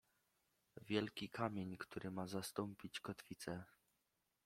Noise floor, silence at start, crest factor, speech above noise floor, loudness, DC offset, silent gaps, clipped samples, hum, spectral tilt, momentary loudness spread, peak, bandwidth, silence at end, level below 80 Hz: -87 dBFS; 0.75 s; 26 dB; 40 dB; -47 LUFS; under 0.1%; none; under 0.1%; none; -5 dB/octave; 10 LU; -24 dBFS; 16.5 kHz; 0.8 s; -78 dBFS